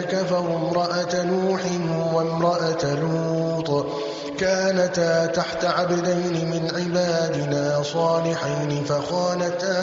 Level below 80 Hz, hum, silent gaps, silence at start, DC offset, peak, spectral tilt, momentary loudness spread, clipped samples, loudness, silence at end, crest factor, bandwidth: -58 dBFS; none; none; 0 s; under 0.1%; -8 dBFS; -5 dB/octave; 4 LU; under 0.1%; -23 LUFS; 0 s; 14 dB; 7.8 kHz